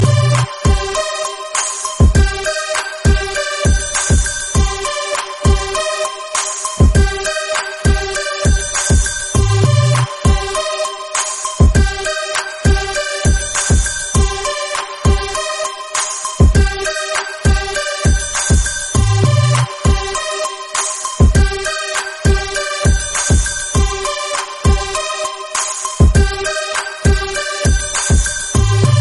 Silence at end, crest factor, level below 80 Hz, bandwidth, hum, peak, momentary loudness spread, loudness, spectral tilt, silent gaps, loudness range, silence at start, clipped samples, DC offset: 0 s; 14 dB; -18 dBFS; 11.5 kHz; none; 0 dBFS; 7 LU; -15 LUFS; -4 dB/octave; none; 2 LU; 0 s; under 0.1%; under 0.1%